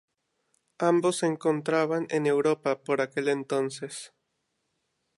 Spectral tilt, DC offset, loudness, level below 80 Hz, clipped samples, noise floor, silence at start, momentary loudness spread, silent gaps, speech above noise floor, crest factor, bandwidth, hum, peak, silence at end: -5 dB/octave; under 0.1%; -27 LUFS; -82 dBFS; under 0.1%; -78 dBFS; 0.8 s; 11 LU; none; 52 dB; 18 dB; 11.5 kHz; none; -10 dBFS; 1.1 s